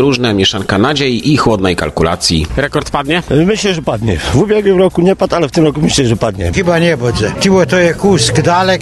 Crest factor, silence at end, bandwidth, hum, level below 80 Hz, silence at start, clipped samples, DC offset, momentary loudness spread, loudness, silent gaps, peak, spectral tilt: 10 dB; 0 s; 12.5 kHz; none; -30 dBFS; 0 s; under 0.1%; under 0.1%; 5 LU; -11 LUFS; none; 0 dBFS; -5 dB/octave